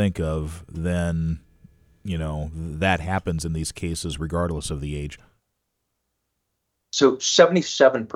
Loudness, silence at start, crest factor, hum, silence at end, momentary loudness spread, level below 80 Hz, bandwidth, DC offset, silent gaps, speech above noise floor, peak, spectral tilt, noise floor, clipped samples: -23 LUFS; 0 s; 22 dB; none; 0 s; 14 LU; -40 dBFS; 14 kHz; under 0.1%; none; 54 dB; -2 dBFS; -4.5 dB/octave; -77 dBFS; under 0.1%